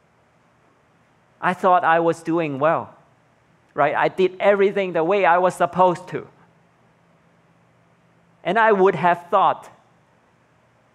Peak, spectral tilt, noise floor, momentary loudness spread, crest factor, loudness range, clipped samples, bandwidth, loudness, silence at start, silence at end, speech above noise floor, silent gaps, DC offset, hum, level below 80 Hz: -2 dBFS; -6.5 dB/octave; -59 dBFS; 13 LU; 18 dB; 4 LU; under 0.1%; 12 kHz; -19 LUFS; 1.4 s; 1.25 s; 40 dB; none; under 0.1%; none; -70 dBFS